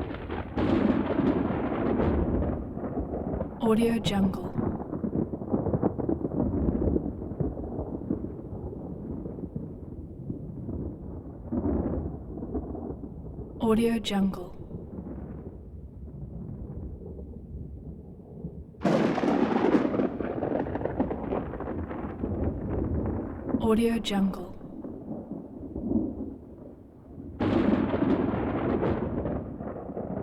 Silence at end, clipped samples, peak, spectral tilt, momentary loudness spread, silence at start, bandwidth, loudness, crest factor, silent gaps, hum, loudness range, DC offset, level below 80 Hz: 0 s; under 0.1%; -10 dBFS; -7.5 dB/octave; 16 LU; 0 s; 14 kHz; -30 LUFS; 20 dB; none; none; 9 LU; under 0.1%; -42 dBFS